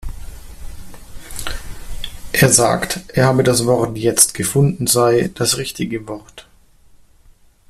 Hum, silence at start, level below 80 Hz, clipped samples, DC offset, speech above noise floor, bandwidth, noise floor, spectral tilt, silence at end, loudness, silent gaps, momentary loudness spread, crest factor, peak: none; 0 s; -36 dBFS; under 0.1%; under 0.1%; 33 dB; 16 kHz; -49 dBFS; -4 dB/octave; 1.3 s; -15 LUFS; none; 20 LU; 18 dB; 0 dBFS